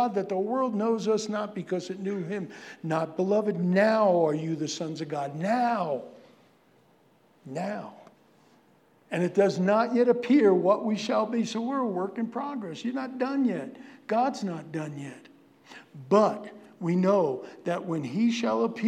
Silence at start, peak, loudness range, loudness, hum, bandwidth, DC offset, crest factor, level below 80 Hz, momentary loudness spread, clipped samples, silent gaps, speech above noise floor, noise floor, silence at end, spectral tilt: 0 s; -10 dBFS; 8 LU; -27 LUFS; none; 11 kHz; under 0.1%; 18 dB; -86 dBFS; 13 LU; under 0.1%; none; 35 dB; -62 dBFS; 0 s; -6.5 dB/octave